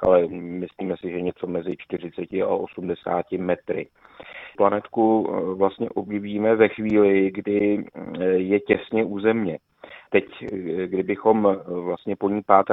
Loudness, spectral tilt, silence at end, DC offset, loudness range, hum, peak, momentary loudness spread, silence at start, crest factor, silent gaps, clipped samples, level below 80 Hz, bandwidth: -23 LUFS; -9.5 dB/octave; 0 s; under 0.1%; 6 LU; none; 0 dBFS; 12 LU; 0 s; 22 dB; none; under 0.1%; -58 dBFS; 4 kHz